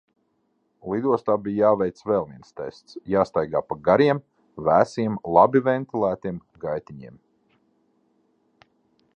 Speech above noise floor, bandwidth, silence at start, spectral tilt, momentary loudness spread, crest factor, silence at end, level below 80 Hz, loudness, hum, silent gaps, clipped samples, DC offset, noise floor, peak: 48 dB; 8.8 kHz; 0.85 s; -8 dB/octave; 18 LU; 22 dB; 2.1 s; -58 dBFS; -22 LUFS; none; none; under 0.1%; under 0.1%; -70 dBFS; -2 dBFS